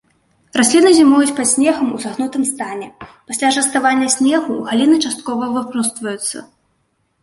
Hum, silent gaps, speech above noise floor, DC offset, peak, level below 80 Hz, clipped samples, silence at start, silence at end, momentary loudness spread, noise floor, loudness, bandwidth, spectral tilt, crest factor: none; none; 50 dB; under 0.1%; 0 dBFS; -60 dBFS; under 0.1%; 0.55 s; 0.8 s; 13 LU; -65 dBFS; -15 LUFS; 12 kHz; -2.5 dB/octave; 14 dB